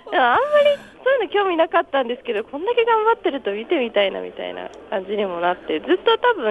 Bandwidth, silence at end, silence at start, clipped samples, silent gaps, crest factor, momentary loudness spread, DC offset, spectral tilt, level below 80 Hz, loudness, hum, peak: 8.2 kHz; 0 s; 0.05 s; under 0.1%; none; 16 dB; 11 LU; under 0.1%; -5.5 dB/octave; -60 dBFS; -20 LUFS; none; -4 dBFS